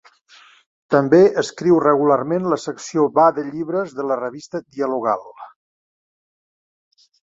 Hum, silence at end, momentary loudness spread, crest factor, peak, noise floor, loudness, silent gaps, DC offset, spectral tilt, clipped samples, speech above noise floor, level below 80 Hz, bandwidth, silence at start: none; 1.9 s; 12 LU; 18 dB; -2 dBFS; -50 dBFS; -18 LUFS; none; under 0.1%; -6.5 dB/octave; under 0.1%; 32 dB; -64 dBFS; 7.8 kHz; 0.9 s